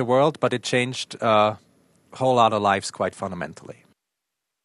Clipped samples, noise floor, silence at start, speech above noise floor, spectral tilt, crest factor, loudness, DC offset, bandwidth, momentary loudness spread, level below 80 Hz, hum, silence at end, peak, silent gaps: under 0.1%; -82 dBFS; 0 s; 60 dB; -5 dB/octave; 20 dB; -22 LUFS; under 0.1%; 12 kHz; 14 LU; -66 dBFS; none; 0.95 s; -4 dBFS; none